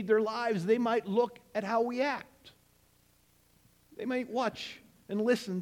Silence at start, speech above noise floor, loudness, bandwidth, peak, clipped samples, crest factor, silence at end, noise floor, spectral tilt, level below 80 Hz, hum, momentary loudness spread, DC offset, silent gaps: 0 s; 36 dB; -32 LUFS; 16 kHz; -14 dBFS; under 0.1%; 18 dB; 0 s; -67 dBFS; -6 dB/octave; -72 dBFS; none; 14 LU; under 0.1%; none